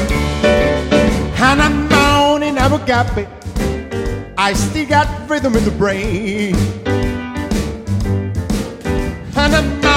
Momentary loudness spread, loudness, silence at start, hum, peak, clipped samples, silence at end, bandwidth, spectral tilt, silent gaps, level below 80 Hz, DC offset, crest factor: 9 LU; -16 LUFS; 0 s; none; 0 dBFS; under 0.1%; 0 s; 16.5 kHz; -5 dB/octave; none; -24 dBFS; under 0.1%; 16 dB